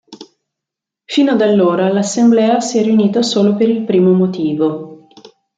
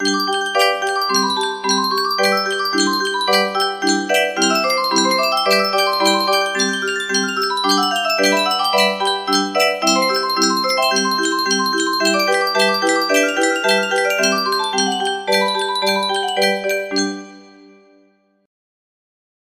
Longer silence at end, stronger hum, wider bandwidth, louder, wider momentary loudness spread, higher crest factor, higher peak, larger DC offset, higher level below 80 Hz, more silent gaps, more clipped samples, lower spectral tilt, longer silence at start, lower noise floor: second, 0.6 s vs 2 s; neither; second, 9.2 kHz vs 15.5 kHz; first, -13 LUFS vs -16 LUFS; about the same, 6 LU vs 4 LU; about the same, 12 dB vs 16 dB; about the same, -2 dBFS vs -2 dBFS; neither; first, -62 dBFS vs -68 dBFS; neither; neither; first, -6 dB/octave vs -2 dB/octave; about the same, 0.1 s vs 0 s; first, -83 dBFS vs -57 dBFS